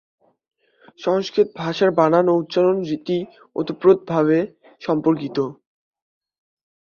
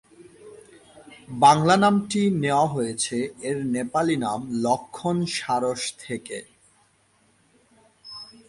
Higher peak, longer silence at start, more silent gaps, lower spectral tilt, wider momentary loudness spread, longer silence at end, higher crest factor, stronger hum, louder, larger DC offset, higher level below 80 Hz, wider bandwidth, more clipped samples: about the same, -2 dBFS vs -4 dBFS; first, 1 s vs 0.2 s; neither; first, -7.5 dB/octave vs -5 dB/octave; second, 11 LU vs 18 LU; first, 1.35 s vs 0.25 s; about the same, 18 dB vs 20 dB; neither; first, -20 LUFS vs -23 LUFS; neither; about the same, -64 dBFS vs -62 dBFS; second, 7 kHz vs 11.5 kHz; neither